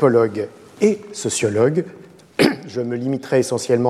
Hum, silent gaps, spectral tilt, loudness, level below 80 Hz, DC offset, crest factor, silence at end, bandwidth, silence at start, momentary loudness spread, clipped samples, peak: none; none; -5 dB/octave; -20 LUFS; -60 dBFS; under 0.1%; 18 dB; 0 s; 14 kHz; 0 s; 10 LU; under 0.1%; -2 dBFS